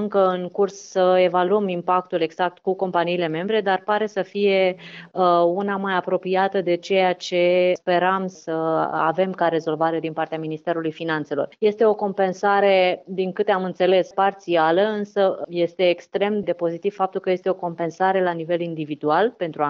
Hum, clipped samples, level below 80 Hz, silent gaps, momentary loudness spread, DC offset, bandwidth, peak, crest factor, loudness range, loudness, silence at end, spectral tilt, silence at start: none; under 0.1%; -74 dBFS; none; 7 LU; under 0.1%; 7.4 kHz; -6 dBFS; 14 dB; 3 LU; -21 LUFS; 0 s; -6 dB/octave; 0 s